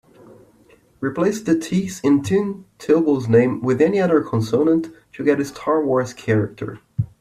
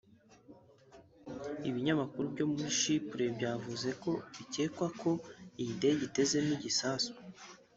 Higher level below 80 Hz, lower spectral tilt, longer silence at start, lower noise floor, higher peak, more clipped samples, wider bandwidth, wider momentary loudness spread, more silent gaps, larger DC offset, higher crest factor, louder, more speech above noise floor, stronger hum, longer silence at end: first, -56 dBFS vs -72 dBFS; first, -7 dB/octave vs -4 dB/octave; first, 1 s vs 0.5 s; second, -53 dBFS vs -60 dBFS; first, -4 dBFS vs -18 dBFS; neither; first, 14.5 kHz vs 8.2 kHz; about the same, 11 LU vs 13 LU; neither; neither; about the same, 16 dB vs 18 dB; first, -19 LUFS vs -35 LUFS; first, 35 dB vs 25 dB; neither; about the same, 0.15 s vs 0.2 s